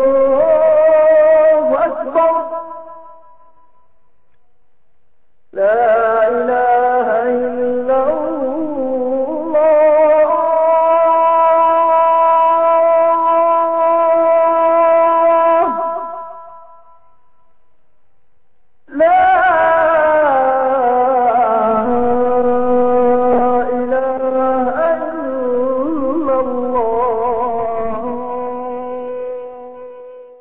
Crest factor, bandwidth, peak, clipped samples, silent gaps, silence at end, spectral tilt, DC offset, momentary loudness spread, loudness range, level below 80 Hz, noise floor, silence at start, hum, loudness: 10 dB; 3.7 kHz; -4 dBFS; under 0.1%; none; 0 s; -10 dB/octave; 0.9%; 12 LU; 9 LU; -48 dBFS; -65 dBFS; 0 s; none; -13 LUFS